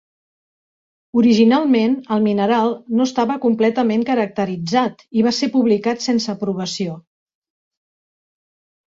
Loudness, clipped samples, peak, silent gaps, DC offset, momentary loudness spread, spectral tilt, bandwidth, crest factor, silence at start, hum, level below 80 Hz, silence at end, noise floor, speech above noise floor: -18 LUFS; under 0.1%; -2 dBFS; none; under 0.1%; 9 LU; -5.5 dB/octave; 7.8 kHz; 16 dB; 1.15 s; none; -62 dBFS; 2 s; under -90 dBFS; over 73 dB